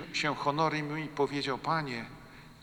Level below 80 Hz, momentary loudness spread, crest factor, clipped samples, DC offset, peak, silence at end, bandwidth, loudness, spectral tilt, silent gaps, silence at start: -62 dBFS; 15 LU; 18 dB; under 0.1%; under 0.1%; -16 dBFS; 0 s; 20 kHz; -32 LUFS; -5 dB/octave; none; 0 s